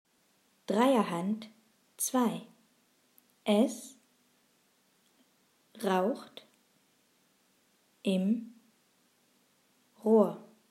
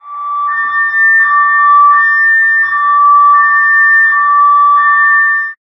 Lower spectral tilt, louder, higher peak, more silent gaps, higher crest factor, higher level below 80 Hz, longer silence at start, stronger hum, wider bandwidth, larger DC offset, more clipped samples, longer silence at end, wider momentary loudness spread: first, -5 dB/octave vs -1.5 dB/octave; second, -31 LUFS vs -7 LUFS; second, -12 dBFS vs 0 dBFS; neither; first, 22 dB vs 8 dB; second, under -90 dBFS vs -62 dBFS; first, 0.7 s vs 0.05 s; neither; first, 15.5 kHz vs 5.8 kHz; neither; neither; first, 0.3 s vs 0.1 s; first, 24 LU vs 6 LU